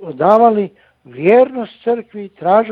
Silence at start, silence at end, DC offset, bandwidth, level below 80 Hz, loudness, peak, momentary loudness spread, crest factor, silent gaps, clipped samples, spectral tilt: 0 s; 0 s; under 0.1%; 5.2 kHz; -62 dBFS; -14 LUFS; 0 dBFS; 12 LU; 14 dB; none; under 0.1%; -8.5 dB/octave